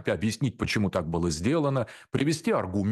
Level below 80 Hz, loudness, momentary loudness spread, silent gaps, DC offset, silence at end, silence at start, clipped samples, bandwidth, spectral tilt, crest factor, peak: -50 dBFS; -27 LUFS; 3 LU; none; under 0.1%; 0 s; 0 s; under 0.1%; 12.5 kHz; -6 dB/octave; 14 dB; -12 dBFS